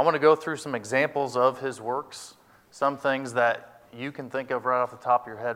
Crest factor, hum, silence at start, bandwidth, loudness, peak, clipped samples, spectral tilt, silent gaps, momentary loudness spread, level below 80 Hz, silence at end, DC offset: 20 dB; none; 0 s; 15.5 kHz; -26 LUFS; -6 dBFS; under 0.1%; -4.5 dB/octave; none; 14 LU; -74 dBFS; 0 s; under 0.1%